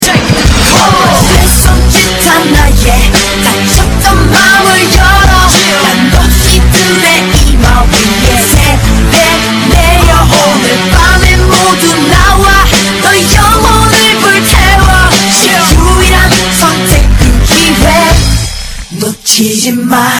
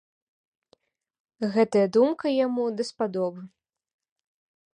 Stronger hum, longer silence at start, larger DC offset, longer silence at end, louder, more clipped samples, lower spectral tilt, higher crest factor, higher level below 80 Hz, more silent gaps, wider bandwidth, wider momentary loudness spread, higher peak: neither; second, 0 s vs 1.4 s; neither; second, 0 s vs 1.25 s; first, -5 LUFS vs -25 LUFS; first, 10% vs under 0.1%; second, -3.5 dB/octave vs -6.5 dB/octave; second, 6 dB vs 18 dB; first, -10 dBFS vs -72 dBFS; neither; first, over 20 kHz vs 10.5 kHz; second, 3 LU vs 10 LU; first, 0 dBFS vs -10 dBFS